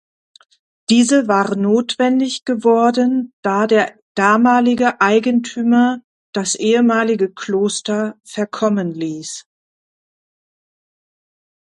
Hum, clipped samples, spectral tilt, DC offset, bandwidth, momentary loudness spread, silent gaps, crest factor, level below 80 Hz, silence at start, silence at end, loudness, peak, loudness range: none; under 0.1%; -4.5 dB/octave; under 0.1%; 11 kHz; 11 LU; 2.42-2.46 s, 3.33-3.43 s, 4.02-4.15 s, 6.04-6.33 s; 16 dB; -66 dBFS; 0.9 s; 2.35 s; -16 LUFS; 0 dBFS; 9 LU